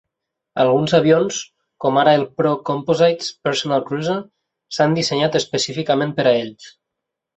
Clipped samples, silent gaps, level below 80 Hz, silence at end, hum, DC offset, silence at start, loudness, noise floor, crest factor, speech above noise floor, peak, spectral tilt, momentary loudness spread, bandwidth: under 0.1%; none; -60 dBFS; 0.7 s; none; under 0.1%; 0.55 s; -18 LUFS; -81 dBFS; 16 dB; 64 dB; -2 dBFS; -5 dB/octave; 9 LU; 8.2 kHz